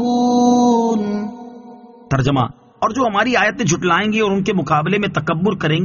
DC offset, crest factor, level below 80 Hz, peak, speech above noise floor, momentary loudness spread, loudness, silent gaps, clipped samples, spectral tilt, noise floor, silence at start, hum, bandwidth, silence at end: under 0.1%; 14 dB; -46 dBFS; -2 dBFS; 23 dB; 9 LU; -17 LUFS; none; under 0.1%; -5 dB/octave; -40 dBFS; 0 s; none; 7.2 kHz; 0 s